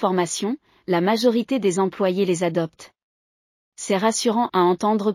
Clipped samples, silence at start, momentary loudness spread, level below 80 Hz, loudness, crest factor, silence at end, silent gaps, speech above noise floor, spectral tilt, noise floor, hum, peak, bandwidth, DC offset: under 0.1%; 0 s; 8 LU; -68 dBFS; -21 LUFS; 14 dB; 0 s; 3.03-3.72 s; over 69 dB; -5 dB/octave; under -90 dBFS; none; -6 dBFS; 15 kHz; under 0.1%